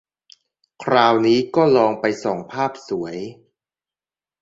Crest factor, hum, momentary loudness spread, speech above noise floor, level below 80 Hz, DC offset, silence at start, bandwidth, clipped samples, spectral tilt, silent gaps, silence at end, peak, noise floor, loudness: 20 dB; none; 15 LU; over 72 dB; -62 dBFS; under 0.1%; 0.8 s; 7.8 kHz; under 0.1%; -6 dB/octave; none; 1.1 s; -2 dBFS; under -90 dBFS; -19 LUFS